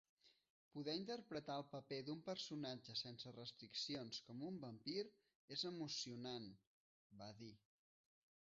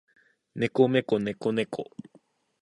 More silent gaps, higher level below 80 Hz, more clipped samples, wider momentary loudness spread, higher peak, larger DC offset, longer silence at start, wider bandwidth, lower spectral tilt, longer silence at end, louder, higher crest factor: first, 0.50-0.71 s, 5.35-5.48 s, 6.67-7.10 s vs none; second, -88 dBFS vs -68 dBFS; neither; second, 10 LU vs 20 LU; second, -34 dBFS vs -8 dBFS; neither; second, 0.25 s vs 0.55 s; second, 7.6 kHz vs 11 kHz; second, -3.5 dB/octave vs -7 dB/octave; first, 0.9 s vs 0.75 s; second, -50 LUFS vs -27 LUFS; about the same, 18 dB vs 20 dB